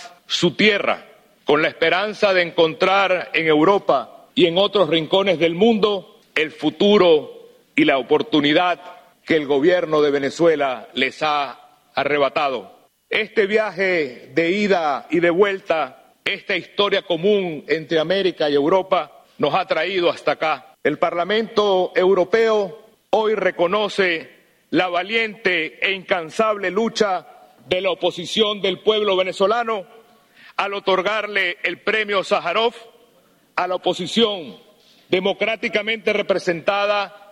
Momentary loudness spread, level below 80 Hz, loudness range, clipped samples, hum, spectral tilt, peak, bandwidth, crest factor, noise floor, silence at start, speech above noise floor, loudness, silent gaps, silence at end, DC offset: 8 LU; -62 dBFS; 4 LU; under 0.1%; none; -4.5 dB/octave; -2 dBFS; 11.5 kHz; 18 dB; -56 dBFS; 0 s; 38 dB; -19 LUFS; none; 0.15 s; under 0.1%